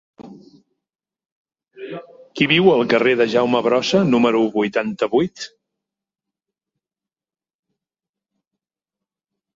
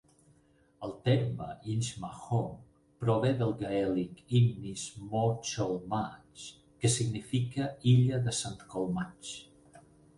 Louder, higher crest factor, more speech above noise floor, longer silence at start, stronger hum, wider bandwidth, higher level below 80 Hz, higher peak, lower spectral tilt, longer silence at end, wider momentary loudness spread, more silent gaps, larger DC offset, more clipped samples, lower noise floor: first, -17 LUFS vs -32 LUFS; about the same, 20 dB vs 18 dB; first, over 73 dB vs 35 dB; second, 0.2 s vs 0.8 s; neither; second, 7.8 kHz vs 11.5 kHz; about the same, -62 dBFS vs -60 dBFS; first, -2 dBFS vs -14 dBFS; about the same, -5.5 dB/octave vs -6 dB/octave; first, 4.1 s vs 0.4 s; first, 20 LU vs 15 LU; first, 1.32-1.45 s vs none; neither; neither; first, under -90 dBFS vs -66 dBFS